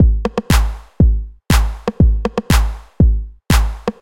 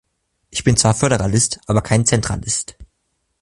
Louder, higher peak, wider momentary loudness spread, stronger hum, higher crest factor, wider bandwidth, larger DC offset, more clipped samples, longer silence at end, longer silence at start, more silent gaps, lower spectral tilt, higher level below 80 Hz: about the same, -17 LUFS vs -17 LUFS; about the same, 0 dBFS vs 0 dBFS; about the same, 8 LU vs 8 LU; neither; about the same, 14 dB vs 18 dB; first, 16.5 kHz vs 11.5 kHz; neither; neither; second, 0.1 s vs 0.6 s; second, 0 s vs 0.55 s; neither; first, -6 dB/octave vs -4 dB/octave; first, -16 dBFS vs -38 dBFS